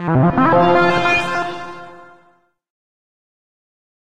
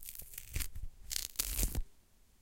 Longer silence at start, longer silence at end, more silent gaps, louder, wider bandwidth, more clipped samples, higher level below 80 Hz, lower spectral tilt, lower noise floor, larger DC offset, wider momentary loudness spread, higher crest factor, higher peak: about the same, 0 s vs 0 s; first, 1.4 s vs 0.4 s; neither; first, -15 LUFS vs -39 LUFS; second, 10.5 kHz vs 17 kHz; neither; about the same, -46 dBFS vs -44 dBFS; first, -7 dB/octave vs -2 dB/octave; second, -57 dBFS vs -64 dBFS; neither; first, 19 LU vs 13 LU; second, 16 dB vs 30 dB; first, -2 dBFS vs -10 dBFS